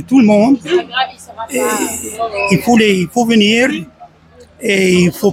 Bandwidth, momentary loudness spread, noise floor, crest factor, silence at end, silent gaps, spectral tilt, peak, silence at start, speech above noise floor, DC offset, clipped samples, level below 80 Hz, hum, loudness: 16.5 kHz; 11 LU; -43 dBFS; 14 dB; 0 s; none; -4.5 dB/octave; 0 dBFS; 0 s; 31 dB; under 0.1%; under 0.1%; -48 dBFS; none; -13 LUFS